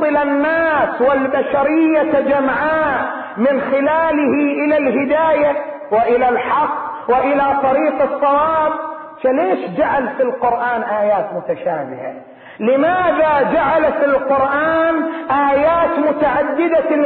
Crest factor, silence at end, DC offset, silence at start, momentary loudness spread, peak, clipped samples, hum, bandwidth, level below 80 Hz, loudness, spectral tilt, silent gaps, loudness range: 10 dB; 0 s; under 0.1%; 0 s; 7 LU; -6 dBFS; under 0.1%; none; 4.5 kHz; -48 dBFS; -15 LUFS; -11 dB/octave; none; 3 LU